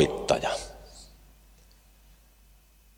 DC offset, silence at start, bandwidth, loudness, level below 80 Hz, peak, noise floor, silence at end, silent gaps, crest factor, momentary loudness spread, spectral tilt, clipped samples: under 0.1%; 0 s; 19 kHz; -29 LUFS; -52 dBFS; -8 dBFS; -58 dBFS; 1.9 s; none; 24 dB; 24 LU; -4.5 dB/octave; under 0.1%